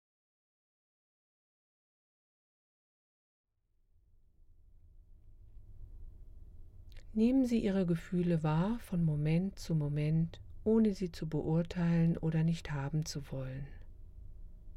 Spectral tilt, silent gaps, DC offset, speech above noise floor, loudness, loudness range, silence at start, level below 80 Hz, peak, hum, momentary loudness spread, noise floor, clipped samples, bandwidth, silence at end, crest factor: -8 dB/octave; none; under 0.1%; 41 dB; -33 LUFS; 4 LU; 4.95 s; -52 dBFS; -20 dBFS; none; 10 LU; -73 dBFS; under 0.1%; 11.5 kHz; 0 s; 16 dB